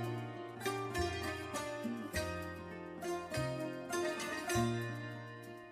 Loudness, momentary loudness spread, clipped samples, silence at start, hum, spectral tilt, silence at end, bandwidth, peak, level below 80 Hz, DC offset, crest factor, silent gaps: -40 LUFS; 10 LU; under 0.1%; 0 s; none; -5 dB/octave; 0 s; 15.5 kHz; -24 dBFS; -58 dBFS; under 0.1%; 16 dB; none